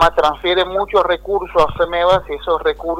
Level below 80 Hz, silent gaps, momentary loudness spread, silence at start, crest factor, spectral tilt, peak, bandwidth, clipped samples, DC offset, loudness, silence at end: -34 dBFS; none; 4 LU; 0 s; 12 dB; -5 dB/octave; -2 dBFS; 15.5 kHz; under 0.1%; under 0.1%; -16 LUFS; 0 s